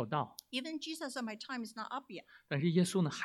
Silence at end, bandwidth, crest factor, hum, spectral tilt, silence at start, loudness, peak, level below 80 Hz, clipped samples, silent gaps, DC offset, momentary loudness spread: 0 s; 14 kHz; 20 dB; none; -5.5 dB/octave; 0 s; -37 LUFS; -18 dBFS; -80 dBFS; under 0.1%; none; under 0.1%; 12 LU